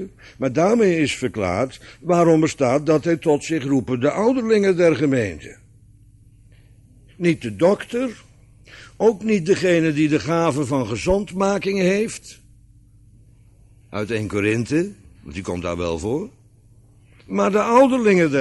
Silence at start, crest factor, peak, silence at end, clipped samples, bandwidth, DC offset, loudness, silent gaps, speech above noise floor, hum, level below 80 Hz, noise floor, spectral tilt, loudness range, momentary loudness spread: 0 s; 16 dB; -4 dBFS; 0 s; under 0.1%; 11.5 kHz; under 0.1%; -20 LUFS; none; 32 dB; 50 Hz at -50 dBFS; -48 dBFS; -51 dBFS; -6 dB/octave; 7 LU; 12 LU